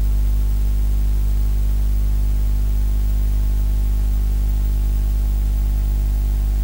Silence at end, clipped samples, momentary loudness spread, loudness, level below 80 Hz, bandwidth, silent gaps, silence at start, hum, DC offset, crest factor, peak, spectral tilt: 0 s; under 0.1%; 0 LU; -21 LUFS; -18 dBFS; 16 kHz; none; 0 s; 50 Hz at -15 dBFS; under 0.1%; 6 dB; -10 dBFS; -7 dB/octave